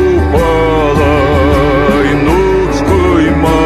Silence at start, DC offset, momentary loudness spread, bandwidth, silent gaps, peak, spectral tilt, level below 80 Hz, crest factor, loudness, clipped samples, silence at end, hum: 0 s; under 0.1%; 1 LU; 14 kHz; none; 0 dBFS; -7 dB/octave; -18 dBFS; 8 dB; -10 LUFS; under 0.1%; 0 s; none